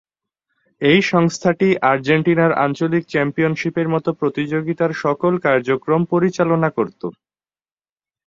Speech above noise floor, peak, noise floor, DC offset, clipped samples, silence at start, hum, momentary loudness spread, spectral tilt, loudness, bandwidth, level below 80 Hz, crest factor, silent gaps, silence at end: over 73 dB; -2 dBFS; under -90 dBFS; under 0.1%; under 0.1%; 0.8 s; none; 6 LU; -6.5 dB/octave; -18 LUFS; 7.6 kHz; -58 dBFS; 16 dB; none; 1.15 s